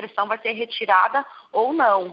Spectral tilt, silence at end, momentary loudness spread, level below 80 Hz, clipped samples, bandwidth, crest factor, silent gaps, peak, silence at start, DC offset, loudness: -6.5 dB/octave; 0 s; 8 LU; -82 dBFS; under 0.1%; 5.4 kHz; 18 dB; none; -4 dBFS; 0 s; under 0.1%; -21 LUFS